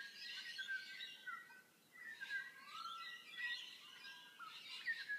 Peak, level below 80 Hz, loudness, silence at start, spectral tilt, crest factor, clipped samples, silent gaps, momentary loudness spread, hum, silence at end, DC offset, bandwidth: -34 dBFS; under -90 dBFS; -49 LUFS; 0 s; 1 dB/octave; 16 dB; under 0.1%; none; 10 LU; none; 0 s; under 0.1%; 15.5 kHz